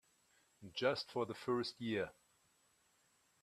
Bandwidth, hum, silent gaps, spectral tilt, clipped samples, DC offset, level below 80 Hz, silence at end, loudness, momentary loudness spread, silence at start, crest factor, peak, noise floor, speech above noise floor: 14 kHz; none; none; -5 dB/octave; under 0.1%; under 0.1%; -80 dBFS; 1.3 s; -41 LUFS; 10 LU; 0.6 s; 22 dB; -22 dBFS; -76 dBFS; 36 dB